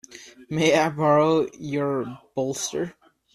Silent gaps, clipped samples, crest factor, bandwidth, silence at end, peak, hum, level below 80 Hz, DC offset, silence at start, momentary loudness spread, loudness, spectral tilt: none; under 0.1%; 18 dB; 14 kHz; 0.45 s; -6 dBFS; none; -64 dBFS; under 0.1%; 0.1 s; 13 LU; -23 LUFS; -5 dB/octave